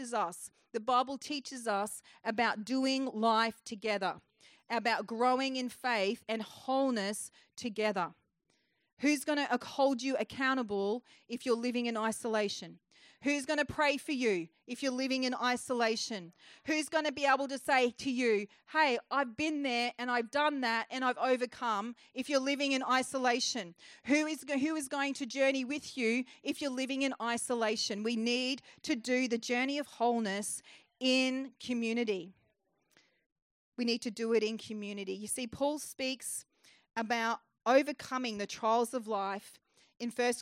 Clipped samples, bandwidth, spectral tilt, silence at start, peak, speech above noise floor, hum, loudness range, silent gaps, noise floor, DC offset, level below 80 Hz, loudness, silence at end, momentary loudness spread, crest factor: under 0.1%; 16 kHz; -3 dB/octave; 0 s; -14 dBFS; 44 dB; none; 4 LU; 8.93-8.97 s, 33.26-33.36 s, 33.42-33.72 s; -77 dBFS; under 0.1%; -76 dBFS; -33 LUFS; 0 s; 10 LU; 20 dB